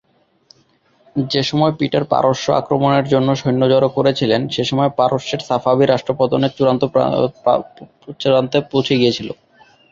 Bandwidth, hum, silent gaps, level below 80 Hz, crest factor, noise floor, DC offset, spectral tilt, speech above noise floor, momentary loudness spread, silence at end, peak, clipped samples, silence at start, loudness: 7.6 kHz; none; none; -54 dBFS; 16 dB; -57 dBFS; under 0.1%; -6.5 dB/octave; 41 dB; 6 LU; 0.6 s; -2 dBFS; under 0.1%; 1.15 s; -16 LUFS